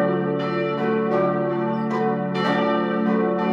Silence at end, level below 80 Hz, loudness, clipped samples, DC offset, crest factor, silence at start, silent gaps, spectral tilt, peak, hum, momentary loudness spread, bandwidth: 0 s; -68 dBFS; -22 LUFS; under 0.1%; under 0.1%; 12 dB; 0 s; none; -8 dB/octave; -8 dBFS; none; 3 LU; 7.4 kHz